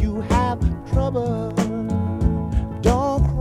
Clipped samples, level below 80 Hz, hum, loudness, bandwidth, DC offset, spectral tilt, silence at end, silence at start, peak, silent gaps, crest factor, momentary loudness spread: under 0.1%; -26 dBFS; none; -22 LUFS; 12 kHz; under 0.1%; -7.5 dB/octave; 0 s; 0 s; -2 dBFS; none; 18 dB; 4 LU